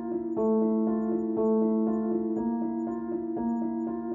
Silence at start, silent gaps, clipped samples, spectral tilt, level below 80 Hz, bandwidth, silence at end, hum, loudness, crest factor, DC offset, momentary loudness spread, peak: 0 s; none; under 0.1%; -12 dB/octave; -62 dBFS; 2.1 kHz; 0 s; none; -28 LUFS; 12 dB; under 0.1%; 7 LU; -16 dBFS